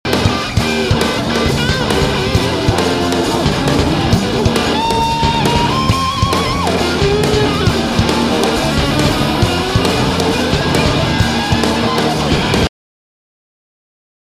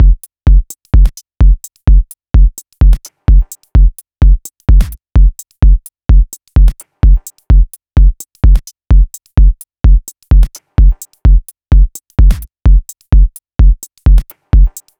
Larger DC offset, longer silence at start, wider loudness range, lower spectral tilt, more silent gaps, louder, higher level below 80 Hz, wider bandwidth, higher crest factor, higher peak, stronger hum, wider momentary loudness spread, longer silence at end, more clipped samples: neither; about the same, 0.05 s vs 0 s; about the same, 1 LU vs 1 LU; second, -5 dB/octave vs -7 dB/octave; neither; about the same, -14 LUFS vs -13 LUFS; second, -26 dBFS vs -8 dBFS; first, 15.5 kHz vs 14 kHz; first, 14 dB vs 8 dB; about the same, 0 dBFS vs 0 dBFS; neither; about the same, 2 LU vs 3 LU; first, 1.55 s vs 0.3 s; second, under 0.1% vs 0.2%